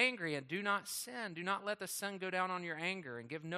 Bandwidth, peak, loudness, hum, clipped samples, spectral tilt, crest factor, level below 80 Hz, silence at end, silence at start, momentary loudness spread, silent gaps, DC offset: 15.5 kHz; -20 dBFS; -39 LUFS; none; under 0.1%; -3 dB/octave; 20 dB; -86 dBFS; 0 s; 0 s; 6 LU; none; under 0.1%